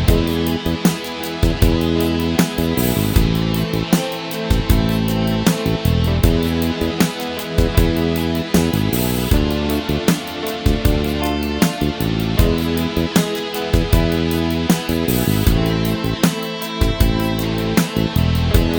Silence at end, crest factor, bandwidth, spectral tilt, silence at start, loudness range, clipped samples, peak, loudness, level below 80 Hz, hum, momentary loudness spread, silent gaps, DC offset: 0 s; 16 dB; over 20 kHz; -5.5 dB/octave; 0 s; 1 LU; under 0.1%; 0 dBFS; -18 LUFS; -24 dBFS; none; 4 LU; none; under 0.1%